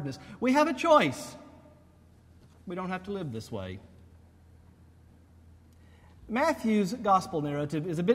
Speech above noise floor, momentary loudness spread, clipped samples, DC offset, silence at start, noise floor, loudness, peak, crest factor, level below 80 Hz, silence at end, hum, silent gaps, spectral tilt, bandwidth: 30 dB; 18 LU; under 0.1%; under 0.1%; 0 s; -58 dBFS; -28 LUFS; -10 dBFS; 22 dB; -60 dBFS; 0 s; none; none; -6 dB/octave; 16 kHz